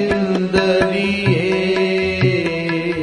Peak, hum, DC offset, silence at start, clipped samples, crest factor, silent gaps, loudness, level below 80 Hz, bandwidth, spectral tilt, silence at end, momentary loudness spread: -2 dBFS; none; 0.1%; 0 s; under 0.1%; 16 dB; none; -17 LUFS; -44 dBFS; 11 kHz; -6.5 dB/octave; 0 s; 4 LU